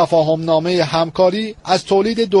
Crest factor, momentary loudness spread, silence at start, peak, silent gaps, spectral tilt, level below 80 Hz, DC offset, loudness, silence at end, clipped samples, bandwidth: 14 dB; 4 LU; 0 s; -2 dBFS; none; -5.5 dB/octave; -50 dBFS; under 0.1%; -16 LUFS; 0 s; under 0.1%; 11.5 kHz